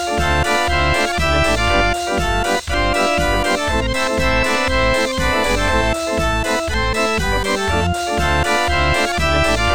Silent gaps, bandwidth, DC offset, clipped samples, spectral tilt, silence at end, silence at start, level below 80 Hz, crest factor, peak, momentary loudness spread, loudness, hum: none; 18 kHz; 3%; under 0.1%; -4 dB/octave; 0 s; 0 s; -26 dBFS; 14 dB; -2 dBFS; 3 LU; -17 LUFS; none